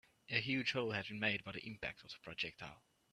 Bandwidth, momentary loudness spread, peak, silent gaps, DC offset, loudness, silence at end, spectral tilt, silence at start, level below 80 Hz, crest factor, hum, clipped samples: 13 kHz; 14 LU; -18 dBFS; none; under 0.1%; -40 LUFS; 0.35 s; -5 dB/octave; 0.3 s; -72 dBFS; 24 dB; none; under 0.1%